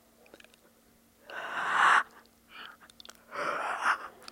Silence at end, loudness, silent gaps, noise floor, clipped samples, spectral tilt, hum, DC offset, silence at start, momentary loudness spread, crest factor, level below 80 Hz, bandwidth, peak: 0.05 s; -28 LUFS; none; -63 dBFS; under 0.1%; -1 dB/octave; none; under 0.1%; 1.3 s; 26 LU; 22 dB; -76 dBFS; 16.5 kHz; -10 dBFS